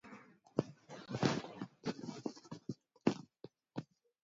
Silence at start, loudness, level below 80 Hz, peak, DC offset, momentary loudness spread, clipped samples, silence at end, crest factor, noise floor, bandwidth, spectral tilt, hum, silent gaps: 0.05 s; -42 LUFS; -76 dBFS; -16 dBFS; under 0.1%; 18 LU; under 0.1%; 0.4 s; 26 dB; -60 dBFS; 7.6 kHz; -5.5 dB/octave; none; none